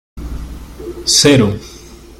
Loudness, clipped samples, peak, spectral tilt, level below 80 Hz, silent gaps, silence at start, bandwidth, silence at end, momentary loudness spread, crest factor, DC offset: -11 LUFS; under 0.1%; 0 dBFS; -3.5 dB/octave; -32 dBFS; none; 0.15 s; 16.5 kHz; 0.1 s; 22 LU; 16 dB; under 0.1%